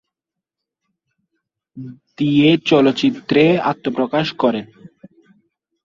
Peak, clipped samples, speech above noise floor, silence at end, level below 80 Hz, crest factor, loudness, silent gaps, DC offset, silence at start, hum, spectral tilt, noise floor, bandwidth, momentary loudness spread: -2 dBFS; under 0.1%; 68 dB; 0.95 s; -60 dBFS; 18 dB; -16 LUFS; none; under 0.1%; 1.75 s; none; -7 dB/octave; -84 dBFS; 7.4 kHz; 22 LU